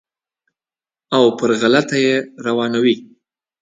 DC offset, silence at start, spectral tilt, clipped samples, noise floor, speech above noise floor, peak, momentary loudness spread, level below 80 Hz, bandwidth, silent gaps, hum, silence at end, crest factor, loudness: under 0.1%; 1.1 s; -5 dB/octave; under 0.1%; under -90 dBFS; over 74 dB; 0 dBFS; 6 LU; -64 dBFS; 9.4 kHz; none; none; 0.55 s; 18 dB; -16 LUFS